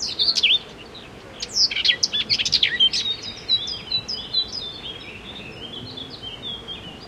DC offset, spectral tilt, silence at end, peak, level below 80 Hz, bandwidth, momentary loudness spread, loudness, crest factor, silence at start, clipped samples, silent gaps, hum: under 0.1%; -0.5 dB/octave; 0 s; -4 dBFS; -52 dBFS; 15 kHz; 18 LU; -20 LUFS; 20 dB; 0 s; under 0.1%; none; none